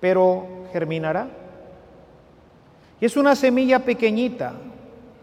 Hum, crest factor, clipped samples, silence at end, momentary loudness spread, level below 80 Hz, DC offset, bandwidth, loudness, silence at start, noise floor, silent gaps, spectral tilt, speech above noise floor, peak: none; 18 dB; under 0.1%; 0.3 s; 17 LU; -60 dBFS; under 0.1%; 15 kHz; -21 LUFS; 0 s; -51 dBFS; none; -6 dB/octave; 31 dB; -4 dBFS